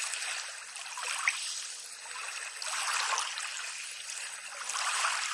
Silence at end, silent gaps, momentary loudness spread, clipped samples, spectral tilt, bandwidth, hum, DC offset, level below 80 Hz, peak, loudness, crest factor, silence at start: 0 s; none; 10 LU; under 0.1%; 5 dB/octave; 11.5 kHz; none; under 0.1%; under -90 dBFS; -14 dBFS; -34 LUFS; 22 dB; 0 s